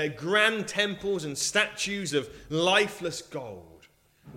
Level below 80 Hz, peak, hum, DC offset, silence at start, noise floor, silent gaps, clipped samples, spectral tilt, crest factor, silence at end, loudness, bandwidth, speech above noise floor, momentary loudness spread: -60 dBFS; -8 dBFS; none; under 0.1%; 0 s; -60 dBFS; none; under 0.1%; -2.5 dB/octave; 22 dB; 0 s; -27 LUFS; 16 kHz; 32 dB; 15 LU